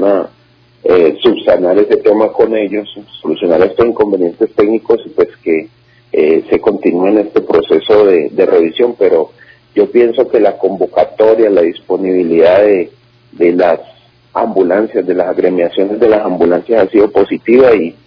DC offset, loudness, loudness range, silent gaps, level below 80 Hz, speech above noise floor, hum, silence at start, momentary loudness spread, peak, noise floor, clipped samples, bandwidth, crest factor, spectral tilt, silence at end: under 0.1%; -11 LUFS; 2 LU; none; -48 dBFS; 37 dB; none; 0 s; 8 LU; 0 dBFS; -47 dBFS; 1%; 5.4 kHz; 10 dB; -8.5 dB/octave; 0.15 s